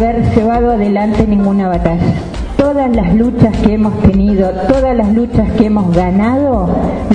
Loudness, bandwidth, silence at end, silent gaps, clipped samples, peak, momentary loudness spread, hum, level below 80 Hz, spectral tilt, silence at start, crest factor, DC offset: -12 LUFS; 9.6 kHz; 0 s; none; 0.2%; 0 dBFS; 3 LU; none; -22 dBFS; -9 dB/octave; 0 s; 10 dB; under 0.1%